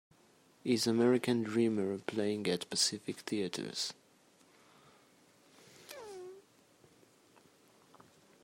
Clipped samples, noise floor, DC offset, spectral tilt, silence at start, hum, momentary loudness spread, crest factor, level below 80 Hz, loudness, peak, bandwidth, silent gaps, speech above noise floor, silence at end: under 0.1%; -66 dBFS; under 0.1%; -4 dB/octave; 0.65 s; none; 20 LU; 20 dB; -82 dBFS; -34 LUFS; -16 dBFS; 16 kHz; none; 33 dB; 2.05 s